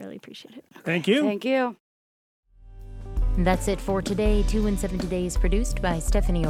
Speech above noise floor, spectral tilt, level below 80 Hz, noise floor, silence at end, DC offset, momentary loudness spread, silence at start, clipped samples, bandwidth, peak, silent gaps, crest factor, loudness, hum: over 66 dB; -5.5 dB/octave; -28 dBFS; under -90 dBFS; 0 s; under 0.1%; 19 LU; 0 s; under 0.1%; 14 kHz; -6 dBFS; 1.80-2.43 s; 18 dB; -25 LUFS; none